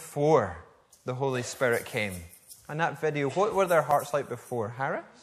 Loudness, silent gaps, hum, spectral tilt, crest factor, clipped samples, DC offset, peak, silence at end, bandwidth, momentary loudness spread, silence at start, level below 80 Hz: -28 LUFS; none; none; -5.5 dB/octave; 20 dB; under 0.1%; under 0.1%; -10 dBFS; 0.15 s; 14.5 kHz; 15 LU; 0 s; -62 dBFS